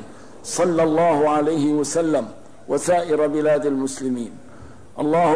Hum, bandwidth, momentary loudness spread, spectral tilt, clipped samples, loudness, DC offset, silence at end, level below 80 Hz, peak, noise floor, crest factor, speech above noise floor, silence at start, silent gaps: none; 11 kHz; 11 LU; -5.5 dB/octave; under 0.1%; -20 LUFS; 0.8%; 0 s; -56 dBFS; -8 dBFS; -43 dBFS; 12 dB; 24 dB; 0 s; none